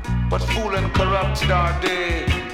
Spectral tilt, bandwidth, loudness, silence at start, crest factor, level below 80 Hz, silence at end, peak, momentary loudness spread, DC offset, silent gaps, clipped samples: -5.5 dB/octave; 15 kHz; -21 LUFS; 0 s; 14 dB; -26 dBFS; 0 s; -6 dBFS; 3 LU; under 0.1%; none; under 0.1%